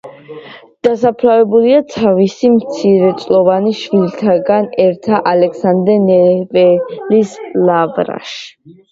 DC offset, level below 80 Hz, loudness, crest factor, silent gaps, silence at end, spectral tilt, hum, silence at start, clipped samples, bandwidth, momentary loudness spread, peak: under 0.1%; -56 dBFS; -12 LUFS; 12 dB; none; 0.2 s; -7 dB/octave; none; 0.05 s; under 0.1%; 7.8 kHz; 10 LU; 0 dBFS